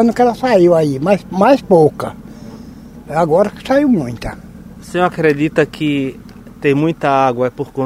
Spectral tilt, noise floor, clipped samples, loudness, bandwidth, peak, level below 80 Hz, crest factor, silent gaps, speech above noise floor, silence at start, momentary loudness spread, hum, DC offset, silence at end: -7 dB/octave; -34 dBFS; under 0.1%; -14 LUFS; 15.5 kHz; 0 dBFS; -42 dBFS; 14 dB; none; 21 dB; 0 s; 22 LU; none; under 0.1%; 0 s